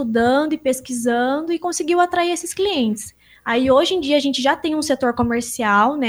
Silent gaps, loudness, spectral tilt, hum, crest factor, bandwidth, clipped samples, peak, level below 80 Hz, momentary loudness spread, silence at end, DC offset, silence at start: none; -19 LUFS; -3.5 dB/octave; none; 16 dB; over 20 kHz; under 0.1%; -4 dBFS; -50 dBFS; 6 LU; 0 s; under 0.1%; 0 s